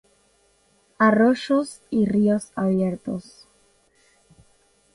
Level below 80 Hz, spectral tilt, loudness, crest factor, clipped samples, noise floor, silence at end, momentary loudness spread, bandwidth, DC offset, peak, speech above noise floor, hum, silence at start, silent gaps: -60 dBFS; -7 dB/octave; -22 LUFS; 18 dB; under 0.1%; -62 dBFS; 1.75 s; 12 LU; 11.5 kHz; under 0.1%; -6 dBFS; 41 dB; none; 1 s; none